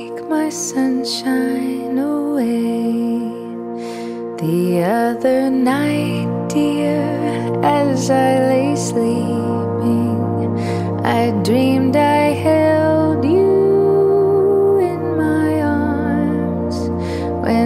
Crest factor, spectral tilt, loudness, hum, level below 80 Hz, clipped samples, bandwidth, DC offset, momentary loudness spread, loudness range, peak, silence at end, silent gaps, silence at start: 16 dB; -6.5 dB/octave; -17 LUFS; none; -46 dBFS; under 0.1%; 15.5 kHz; under 0.1%; 7 LU; 5 LU; -2 dBFS; 0 s; none; 0 s